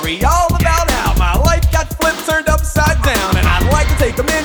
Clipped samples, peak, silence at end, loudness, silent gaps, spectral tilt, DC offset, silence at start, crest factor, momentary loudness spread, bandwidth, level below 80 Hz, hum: under 0.1%; 0 dBFS; 0 s; -14 LUFS; none; -4.5 dB/octave; under 0.1%; 0 s; 12 dB; 2 LU; over 20 kHz; -16 dBFS; none